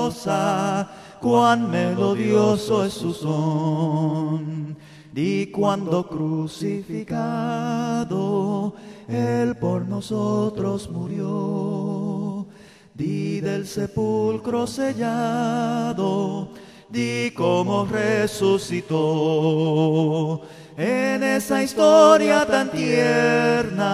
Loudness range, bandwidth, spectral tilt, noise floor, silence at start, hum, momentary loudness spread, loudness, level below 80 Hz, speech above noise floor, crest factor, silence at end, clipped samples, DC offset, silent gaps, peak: 8 LU; 14.5 kHz; -6 dB/octave; -47 dBFS; 0 s; none; 10 LU; -22 LUFS; -58 dBFS; 26 dB; 20 dB; 0 s; under 0.1%; under 0.1%; none; -2 dBFS